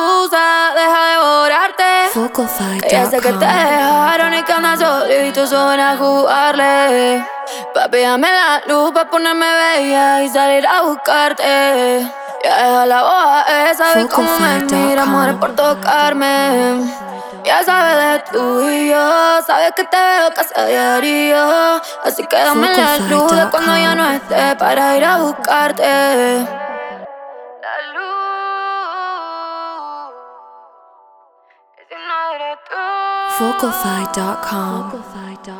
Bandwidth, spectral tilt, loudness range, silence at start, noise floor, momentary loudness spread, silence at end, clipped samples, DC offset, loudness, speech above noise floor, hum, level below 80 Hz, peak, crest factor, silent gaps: over 20 kHz; -3 dB/octave; 10 LU; 0 s; -52 dBFS; 12 LU; 0 s; under 0.1%; under 0.1%; -13 LUFS; 39 dB; none; -58 dBFS; 0 dBFS; 14 dB; none